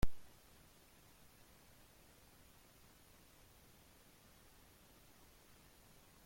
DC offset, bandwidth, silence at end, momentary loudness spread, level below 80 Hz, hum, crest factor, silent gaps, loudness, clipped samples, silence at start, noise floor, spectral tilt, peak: under 0.1%; 16.5 kHz; 6.05 s; 0 LU; -56 dBFS; none; 24 dB; none; -62 LUFS; under 0.1%; 0.05 s; -65 dBFS; -5 dB/octave; -20 dBFS